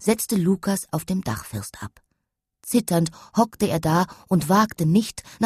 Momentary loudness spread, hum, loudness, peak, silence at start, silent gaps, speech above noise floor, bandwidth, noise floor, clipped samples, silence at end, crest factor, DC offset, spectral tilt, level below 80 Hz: 13 LU; none; -23 LUFS; -4 dBFS; 0 s; none; 58 dB; 14 kHz; -80 dBFS; under 0.1%; 0 s; 18 dB; under 0.1%; -5.5 dB/octave; -52 dBFS